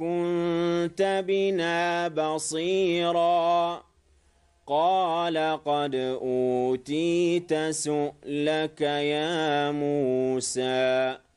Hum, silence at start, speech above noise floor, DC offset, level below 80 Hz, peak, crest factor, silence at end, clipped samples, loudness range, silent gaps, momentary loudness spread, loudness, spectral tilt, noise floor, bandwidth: none; 0 s; 38 dB; under 0.1%; -66 dBFS; -14 dBFS; 12 dB; 0.2 s; under 0.1%; 2 LU; none; 4 LU; -26 LUFS; -4.5 dB/octave; -63 dBFS; 11.5 kHz